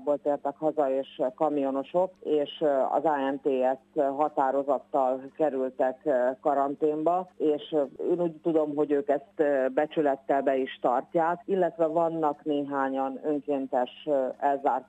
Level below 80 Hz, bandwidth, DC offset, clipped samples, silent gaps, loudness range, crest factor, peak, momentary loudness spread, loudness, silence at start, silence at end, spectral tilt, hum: -80 dBFS; 8.8 kHz; under 0.1%; under 0.1%; none; 1 LU; 16 dB; -10 dBFS; 3 LU; -28 LUFS; 0 s; 0.05 s; -7.5 dB/octave; 50 Hz at -65 dBFS